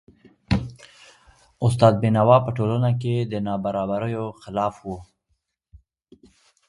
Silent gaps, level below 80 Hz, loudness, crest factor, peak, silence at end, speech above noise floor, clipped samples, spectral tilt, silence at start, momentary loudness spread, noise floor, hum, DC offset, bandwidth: none; -46 dBFS; -22 LUFS; 20 dB; -2 dBFS; 1.65 s; 52 dB; under 0.1%; -8 dB/octave; 0.5 s; 13 LU; -73 dBFS; none; under 0.1%; 11.5 kHz